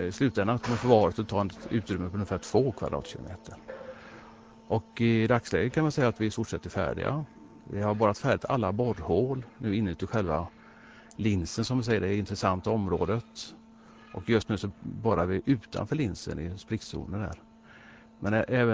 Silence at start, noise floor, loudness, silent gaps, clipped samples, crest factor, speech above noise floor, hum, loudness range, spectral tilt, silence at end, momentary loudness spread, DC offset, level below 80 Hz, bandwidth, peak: 0 s; -53 dBFS; -29 LUFS; none; under 0.1%; 22 dB; 24 dB; none; 4 LU; -6.5 dB/octave; 0 s; 16 LU; under 0.1%; -48 dBFS; 8 kHz; -6 dBFS